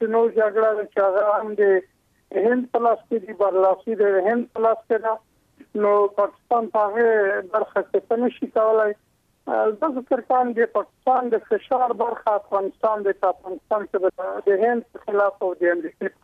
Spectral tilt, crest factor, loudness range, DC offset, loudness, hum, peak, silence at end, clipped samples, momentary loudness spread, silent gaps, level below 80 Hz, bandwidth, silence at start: -7.5 dB/octave; 12 dB; 2 LU; under 0.1%; -22 LUFS; none; -8 dBFS; 0.15 s; under 0.1%; 7 LU; none; -70 dBFS; 4.2 kHz; 0 s